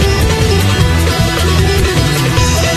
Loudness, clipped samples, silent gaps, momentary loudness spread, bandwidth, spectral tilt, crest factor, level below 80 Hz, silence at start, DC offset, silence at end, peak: -11 LUFS; under 0.1%; none; 1 LU; 14.5 kHz; -4.5 dB/octave; 10 dB; -18 dBFS; 0 s; under 0.1%; 0 s; 0 dBFS